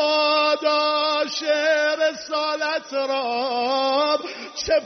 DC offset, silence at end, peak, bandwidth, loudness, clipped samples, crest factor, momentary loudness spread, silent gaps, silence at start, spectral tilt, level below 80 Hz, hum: under 0.1%; 0 s; -8 dBFS; 6.4 kHz; -21 LUFS; under 0.1%; 12 dB; 6 LU; none; 0 s; 1.5 dB/octave; -56 dBFS; none